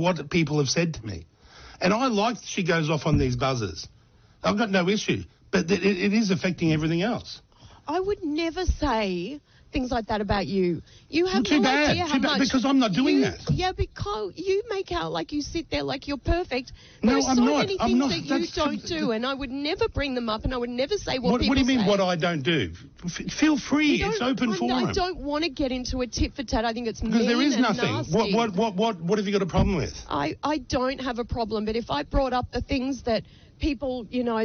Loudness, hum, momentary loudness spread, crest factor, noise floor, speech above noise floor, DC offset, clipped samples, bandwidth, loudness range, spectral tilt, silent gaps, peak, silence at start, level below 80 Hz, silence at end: -25 LUFS; none; 9 LU; 14 dB; -54 dBFS; 29 dB; under 0.1%; under 0.1%; 6.6 kHz; 4 LU; -4.5 dB/octave; none; -10 dBFS; 0 s; -40 dBFS; 0 s